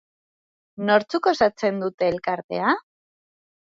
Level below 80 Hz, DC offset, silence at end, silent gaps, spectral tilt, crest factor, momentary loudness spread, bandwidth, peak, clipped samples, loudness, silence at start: -62 dBFS; under 0.1%; 0.9 s; 1.94-1.98 s, 2.44-2.49 s; -5.5 dB/octave; 20 dB; 7 LU; 7.6 kHz; -4 dBFS; under 0.1%; -23 LUFS; 0.8 s